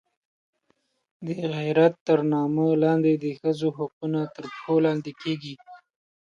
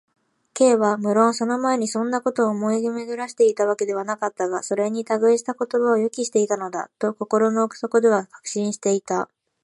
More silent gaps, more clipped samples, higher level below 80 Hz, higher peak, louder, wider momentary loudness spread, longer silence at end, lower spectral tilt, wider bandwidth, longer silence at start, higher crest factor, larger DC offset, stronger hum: first, 2.01-2.06 s, 3.93-4.01 s vs none; neither; about the same, -72 dBFS vs -76 dBFS; about the same, -6 dBFS vs -4 dBFS; about the same, -24 LUFS vs -22 LUFS; first, 13 LU vs 8 LU; first, 0.55 s vs 0.4 s; first, -8 dB/octave vs -4.5 dB/octave; second, 7.2 kHz vs 11.5 kHz; first, 1.2 s vs 0.55 s; about the same, 18 dB vs 18 dB; neither; neither